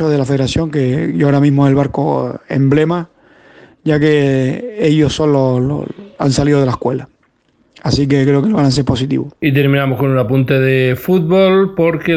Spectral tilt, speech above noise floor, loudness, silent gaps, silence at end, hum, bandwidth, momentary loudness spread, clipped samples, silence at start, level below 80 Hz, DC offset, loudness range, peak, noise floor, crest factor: -7 dB/octave; 44 dB; -14 LUFS; none; 0 s; none; 15.5 kHz; 7 LU; under 0.1%; 0 s; -40 dBFS; under 0.1%; 2 LU; 0 dBFS; -57 dBFS; 12 dB